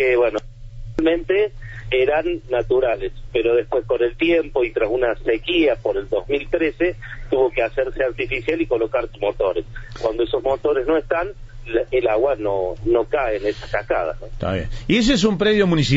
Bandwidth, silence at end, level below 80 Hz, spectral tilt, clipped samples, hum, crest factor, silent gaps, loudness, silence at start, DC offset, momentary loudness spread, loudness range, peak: 8 kHz; 0 s; -36 dBFS; -6 dB/octave; under 0.1%; none; 16 dB; none; -20 LUFS; 0 s; under 0.1%; 8 LU; 2 LU; -4 dBFS